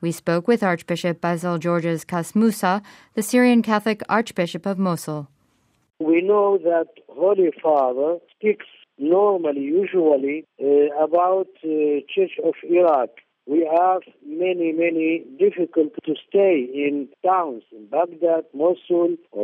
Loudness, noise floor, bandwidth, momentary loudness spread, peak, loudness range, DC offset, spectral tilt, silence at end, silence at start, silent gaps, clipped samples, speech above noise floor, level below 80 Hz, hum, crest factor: -21 LUFS; -64 dBFS; 15.5 kHz; 8 LU; -4 dBFS; 2 LU; under 0.1%; -6.5 dB/octave; 0 s; 0 s; none; under 0.1%; 44 dB; -74 dBFS; none; 16 dB